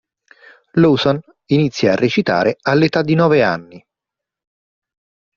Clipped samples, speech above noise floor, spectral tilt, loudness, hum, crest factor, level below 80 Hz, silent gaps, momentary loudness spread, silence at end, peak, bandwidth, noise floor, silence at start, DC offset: under 0.1%; 70 dB; -5 dB/octave; -15 LUFS; none; 16 dB; -54 dBFS; none; 6 LU; 1.6 s; -2 dBFS; 7.2 kHz; -85 dBFS; 0.75 s; under 0.1%